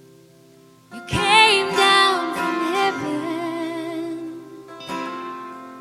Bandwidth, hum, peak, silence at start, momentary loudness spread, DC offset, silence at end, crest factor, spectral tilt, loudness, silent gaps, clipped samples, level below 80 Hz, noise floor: 16 kHz; none; 0 dBFS; 0.9 s; 22 LU; under 0.1%; 0 s; 22 dB; -3 dB/octave; -19 LUFS; none; under 0.1%; -52 dBFS; -50 dBFS